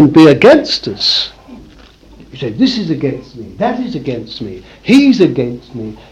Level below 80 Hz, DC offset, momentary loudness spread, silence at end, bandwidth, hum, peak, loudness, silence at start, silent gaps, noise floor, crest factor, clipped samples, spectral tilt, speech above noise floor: -44 dBFS; under 0.1%; 19 LU; 0.15 s; 10 kHz; none; 0 dBFS; -11 LUFS; 0 s; none; -40 dBFS; 12 dB; 0.7%; -6 dB/octave; 28 dB